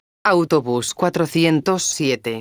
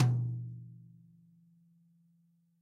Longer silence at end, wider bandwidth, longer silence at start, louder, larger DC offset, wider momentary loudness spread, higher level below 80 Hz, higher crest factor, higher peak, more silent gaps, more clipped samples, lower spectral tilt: second, 0 s vs 1.85 s; first, over 20 kHz vs 6.8 kHz; first, 0.25 s vs 0 s; first, -18 LUFS vs -36 LUFS; neither; second, 4 LU vs 27 LU; first, -58 dBFS vs -72 dBFS; second, 16 dB vs 22 dB; first, -2 dBFS vs -14 dBFS; neither; neither; second, -4.5 dB/octave vs -8 dB/octave